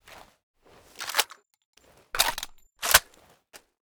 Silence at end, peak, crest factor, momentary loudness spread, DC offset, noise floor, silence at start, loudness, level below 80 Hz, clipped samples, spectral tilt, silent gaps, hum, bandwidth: 0.45 s; -2 dBFS; 30 dB; 17 LU; under 0.1%; -59 dBFS; 0.1 s; -25 LUFS; -52 dBFS; under 0.1%; 1 dB/octave; 0.43-0.54 s, 1.65-1.73 s; none; over 20 kHz